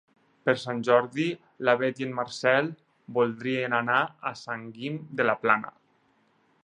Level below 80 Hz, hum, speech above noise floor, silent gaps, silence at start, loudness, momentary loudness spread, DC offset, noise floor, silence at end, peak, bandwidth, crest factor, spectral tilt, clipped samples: -76 dBFS; none; 40 dB; none; 0.45 s; -27 LUFS; 12 LU; under 0.1%; -67 dBFS; 0.95 s; -6 dBFS; 10.5 kHz; 22 dB; -5.5 dB/octave; under 0.1%